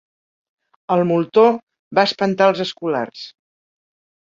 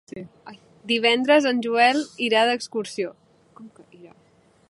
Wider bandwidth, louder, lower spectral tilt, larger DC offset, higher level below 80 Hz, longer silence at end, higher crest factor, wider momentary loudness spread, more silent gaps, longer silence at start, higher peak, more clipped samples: second, 7.6 kHz vs 11.5 kHz; first, -18 LUFS vs -21 LUFS; first, -6 dB/octave vs -3 dB/octave; neither; first, -66 dBFS vs -72 dBFS; first, 1.05 s vs 0.65 s; about the same, 18 dB vs 20 dB; second, 14 LU vs 21 LU; first, 1.63-1.67 s, 1.79-1.91 s vs none; first, 0.9 s vs 0.15 s; about the same, -2 dBFS vs -4 dBFS; neither